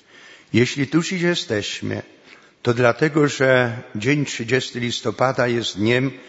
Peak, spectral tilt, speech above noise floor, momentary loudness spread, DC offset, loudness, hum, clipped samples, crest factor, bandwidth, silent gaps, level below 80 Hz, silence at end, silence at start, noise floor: 0 dBFS; -5 dB/octave; 27 dB; 8 LU; under 0.1%; -20 LUFS; none; under 0.1%; 20 dB; 8 kHz; none; -60 dBFS; 0 s; 0.3 s; -47 dBFS